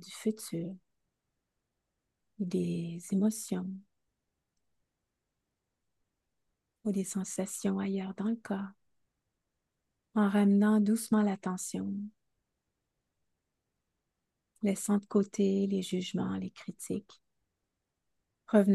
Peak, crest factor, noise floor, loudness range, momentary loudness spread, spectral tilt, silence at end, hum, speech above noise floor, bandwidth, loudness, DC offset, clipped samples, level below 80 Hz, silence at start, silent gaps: -12 dBFS; 22 dB; -85 dBFS; 11 LU; 13 LU; -6 dB/octave; 0 s; none; 55 dB; 12.5 kHz; -32 LUFS; under 0.1%; under 0.1%; -78 dBFS; 0 s; none